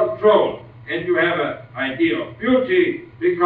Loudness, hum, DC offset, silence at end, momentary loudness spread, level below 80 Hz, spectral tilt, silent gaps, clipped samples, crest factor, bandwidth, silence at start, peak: -19 LUFS; none; under 0.1%; 0 s; 10 LU; -56 dBFS; -8.5 dB/octave; none; under 0.1%; 16 dB; 4.4 kHz; 0 s; -4 dBFS